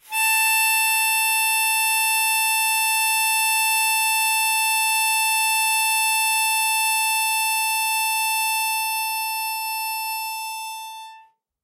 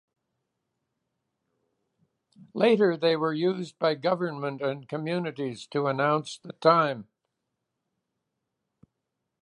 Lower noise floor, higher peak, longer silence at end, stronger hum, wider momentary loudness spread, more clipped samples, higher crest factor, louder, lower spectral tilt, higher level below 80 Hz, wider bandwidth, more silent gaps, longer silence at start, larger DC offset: second, -51 dBFS vs -83 dBFS; second, -10 dBFS vs -6 dBFS; second, 0.45 s vs 2.4 s; neither; second, 8 LU vs 11 LU; neither; second, 12 dB vs 22 dB; first, -19 LUFS vs -26 LUFS; second, 6.5 dB/octave vs -6.5 dB/octave; second, -88 dBFS vs -82 dBFS; first, 15.5 kHz vs 11 kHz; neither; second, 0.1 s vs 2.55 s; neither